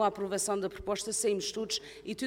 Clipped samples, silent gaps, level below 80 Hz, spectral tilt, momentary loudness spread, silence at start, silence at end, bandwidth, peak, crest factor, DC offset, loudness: under 0.1%; none; -60 dBFS; -2.5 dB/octave; 5 LU; 0 s; 0 s; 17 kHz; -16 dBFS; 18 dB; under 0.1%; -33 LUFS